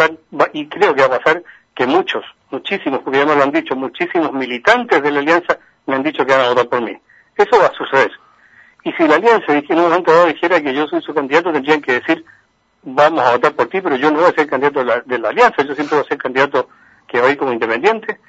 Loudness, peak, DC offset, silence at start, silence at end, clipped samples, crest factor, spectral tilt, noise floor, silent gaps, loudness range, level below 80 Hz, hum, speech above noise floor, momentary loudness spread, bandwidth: -15 LUFS; 0 dBFS; under 0.1%; 0 s; 0.15 s; under 0.1%; 16 dB; -5 dB/octave; -48 dBFS; none; 2 LU; -60 dBFS; none; 33 dB; 9 LU; 8 kHz